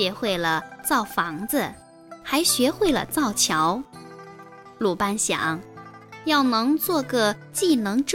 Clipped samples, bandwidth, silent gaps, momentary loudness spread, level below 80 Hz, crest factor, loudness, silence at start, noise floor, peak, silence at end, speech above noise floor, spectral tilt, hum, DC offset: under 0.1%; 17 kHz; none; 20 LU; -54 dBFS; 16 dB; -23 LUFS; 0 s; -44 dBFS; -8 dBFS; 0 s; 22 dB; -3 dB/octave; none; under 0.1%